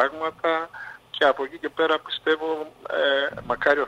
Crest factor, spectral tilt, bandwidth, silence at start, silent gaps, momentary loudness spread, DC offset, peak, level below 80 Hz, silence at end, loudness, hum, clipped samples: 18 dB; -4 dB/octave; 11 kHz; 0 s; none; 9 LU; under 0.1%; -6 dBFS; -60 dBFS; 0 s; -24 LUFS; none; under 0.1%